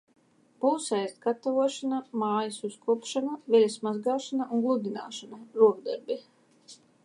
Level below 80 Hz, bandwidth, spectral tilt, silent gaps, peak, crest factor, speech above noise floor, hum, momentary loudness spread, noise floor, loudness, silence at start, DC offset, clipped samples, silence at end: -86 dBFS; 11 kHz; -4.5 dB/octave; none; -10 dBFS; 20 dB; 27 dB; none; 12 LU; -55 dBFS; -28 LUFS; 0.6 s; under 0.1%; under 0.1%; 0.3 s